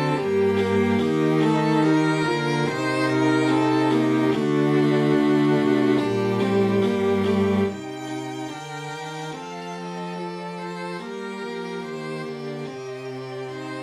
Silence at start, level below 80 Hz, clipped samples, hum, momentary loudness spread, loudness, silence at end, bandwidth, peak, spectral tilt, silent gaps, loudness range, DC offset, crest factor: 0 s; -64 dBFS; under 0.1%; none; 13 LU; -23 LUFS; 0 s; 12.5 kHz; -8 dBFS; -6.5 dB/octave; none; 12 LU; under 0.1%; 14 dB